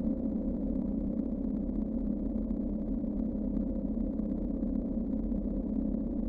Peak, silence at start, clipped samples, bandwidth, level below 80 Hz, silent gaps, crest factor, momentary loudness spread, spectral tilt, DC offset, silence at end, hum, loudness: -20 dBFS; 0 s; under 0.1%; 2.3 kHz; -40 dBFS; none; 12 dB; 1 LU; -13 dB/octave; under 0.1%; 0 s; none; -34 LUFS